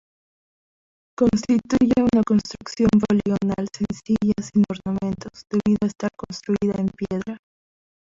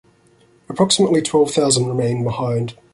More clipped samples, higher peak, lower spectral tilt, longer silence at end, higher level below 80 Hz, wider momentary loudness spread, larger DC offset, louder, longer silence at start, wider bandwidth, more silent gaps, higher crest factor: neither; second, -6 dBFS vs -2 dBFS; first, -7 dB/octave vs -4.5 dB/octave; first, 0.85 s vs 0.2 s; first, -48 dBFS vs -54 dBFS; first, 11 LU vs 7 LU; neither; second, -22 LUFS vs -17 LUFS; first, 1.2 s vs 0.7 s; second, 7.6 kHz vs 11.5 kHz; neither; about the same, 16 dB vs 16 dB